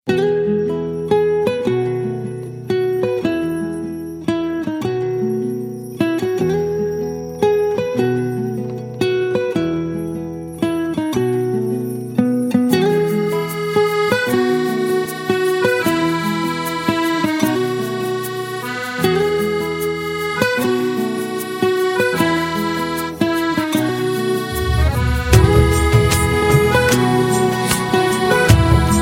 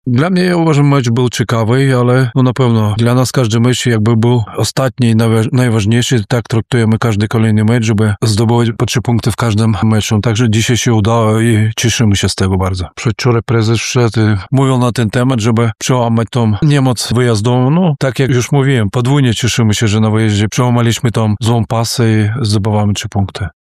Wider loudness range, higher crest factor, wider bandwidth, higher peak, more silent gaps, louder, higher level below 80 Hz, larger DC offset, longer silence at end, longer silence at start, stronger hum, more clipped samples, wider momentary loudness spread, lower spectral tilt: first, 6 LU vs 1 LU; first, 18 dB vs 10 dB; first, 16.5 kHz vs 14 kHz; about the same, 0 dBFS vs -2 dBFS; neither; second, -18 LUFS vs -12 LUFS; first, -30 dBFS vs -40 dBFS; neither; second, 0 s vs 0.15 s; about the same, 0.05 s vs 0.05 s; neither; neither; first, 9 LU vs 3 LU; about the same, -5.5 dB/octave vs -6 dB/octave